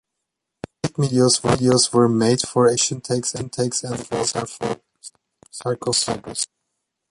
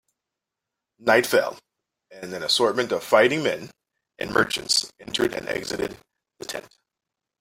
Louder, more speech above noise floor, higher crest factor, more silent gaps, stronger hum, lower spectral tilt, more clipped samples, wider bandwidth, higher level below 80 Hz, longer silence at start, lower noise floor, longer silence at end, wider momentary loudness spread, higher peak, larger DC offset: first, -20 LUFS vs -23 LUFS; about the same, 61 dB vs 63 dB; about the same, 18 dB vs 22 dB; neither; neither; first, -4 dB/octave vs -2.5 dB/octave; neither; second, 11.5 kHz vs 16.5 kHz; first, -52 dBFS vs -60 dBFS; second, 0.85 s vs 1 s; second, -80 dBFS vs -86 dBFS; second, 0.65 s vs 0.8 s; second, 12 LU vs 16 LU; about the same, -4 dBFS vs -2 dBFS; neither